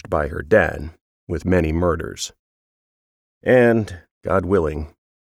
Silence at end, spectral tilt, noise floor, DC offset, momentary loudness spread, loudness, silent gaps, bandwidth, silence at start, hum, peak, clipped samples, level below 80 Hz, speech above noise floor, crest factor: 0.4 s; -6.5 dB/octave; under -90 dBFS; under 0.1%; 17 LU; -20 LUFS; 1.01-1.27 s, 2.39-3.41 s, 4.11-4.21 s; 14.5 kHz; 0.05 s; none; -2 dBFS; under 0.1%; -36 dBFS; over 71 dB; 18 dB